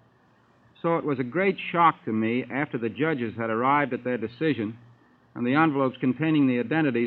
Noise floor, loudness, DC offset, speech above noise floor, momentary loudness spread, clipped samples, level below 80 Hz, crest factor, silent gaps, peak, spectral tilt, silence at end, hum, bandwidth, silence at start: -61 dBFS; -25 LUFS; under 0.1%; 36 dB; 8 LU; under 0.1%; -72 dBFS; 20 dB; none; -6 dBFS; -10 dB/octave; 0 s; none; 4.5 kHz; 0.85 s